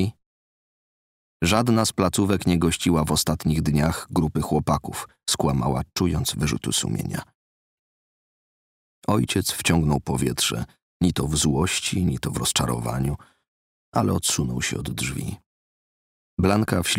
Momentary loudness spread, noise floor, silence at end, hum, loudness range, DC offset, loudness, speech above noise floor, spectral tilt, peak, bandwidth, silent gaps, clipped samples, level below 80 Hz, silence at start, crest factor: 8 LU; under -90 dBFS; 0 s; none; 5 LU; under 0.1%; -23 LUFS; over 67 dB; -4.5 dB/octave; -4 dBFS; 16 kHz; 0.26-1.40 s, 7.35-9.02 s, 10.83-11.00 s, 13.48-13.92 s, 15.46-16.37 s; under 0.1%; -40 dBFS; 0 s; 20 dB